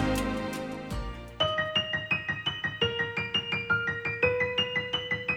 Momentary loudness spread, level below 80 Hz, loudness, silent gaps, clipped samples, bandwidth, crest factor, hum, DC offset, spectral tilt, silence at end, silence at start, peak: 10 LU; -46 dBFS; -29 LUFS; none; under 0.1%; over 20 kHz; 20 dB; none; under 0.1%; -4.5 dB/octave; 0 s; 0 s; -12 dBFS